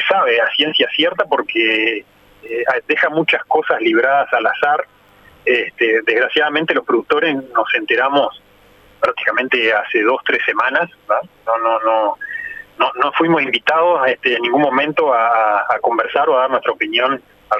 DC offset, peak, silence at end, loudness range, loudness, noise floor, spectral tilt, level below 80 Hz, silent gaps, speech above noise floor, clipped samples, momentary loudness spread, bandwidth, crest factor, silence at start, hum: under 0.1%; 0 dBFS; 0 s; 2 LU; -15 LUFS; -48 dBFS; -5.5 dB/octave; -62 dBFS; none; 32 dB; under 0.1%; 6 LU; 12.5 kHz; 16 dB; 0 s; none